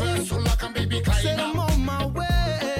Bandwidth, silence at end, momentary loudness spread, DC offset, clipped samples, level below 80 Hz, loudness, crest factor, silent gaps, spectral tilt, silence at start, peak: 16.5 kHz; 0 s; 3 LU; under 0.1%; under 0.1%; -28 dBFS; -24 LUFS; 12 dB; none; -5 dB/octave; 0 s; -10 dBFS